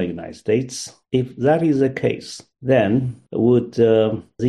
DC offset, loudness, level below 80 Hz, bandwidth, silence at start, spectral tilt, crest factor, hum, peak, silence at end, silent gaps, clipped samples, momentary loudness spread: under 0.1%; -19 LUFS; -54 dBFS; 12 kHz; 0 s; -6.5 dB/octave; 16 dB; none; -4 dBFS; 0 s; none; under 0.1%; 12 LU